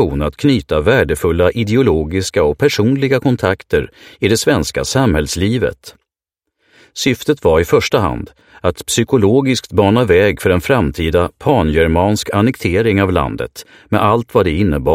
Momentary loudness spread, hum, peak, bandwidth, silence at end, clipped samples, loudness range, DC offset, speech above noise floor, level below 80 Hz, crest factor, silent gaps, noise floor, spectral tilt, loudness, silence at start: 7 LU; none; 0 dBFS; 16.5 kHz; 0 s; under 0.1%; 4 LU; under 0.1%; 65 dB; -32 dBFS; 14 dB; none; -78 dBFS; -5.5 dB/octave; -14 LUFS; 0 s